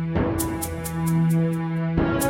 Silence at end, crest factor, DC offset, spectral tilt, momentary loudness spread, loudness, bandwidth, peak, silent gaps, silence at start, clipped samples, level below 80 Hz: 0 s; 14 dB; under 0.1%; -6.5 dB/octave; 6 LU; -24 LUFS; 16.5 kHz; -8 dBFS; none; 0 s; under 0.1%; -38 dBFS